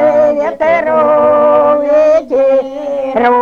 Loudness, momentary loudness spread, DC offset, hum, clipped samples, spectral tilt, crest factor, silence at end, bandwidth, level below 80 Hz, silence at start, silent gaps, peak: -10 LUFS; 6 LU; 0.4%; none; under 0.1%; -6.5 dB/octave; 10 dB; 0 s; 6.8 kHz; -48 dBFS; 0 s; none; 0 dBFS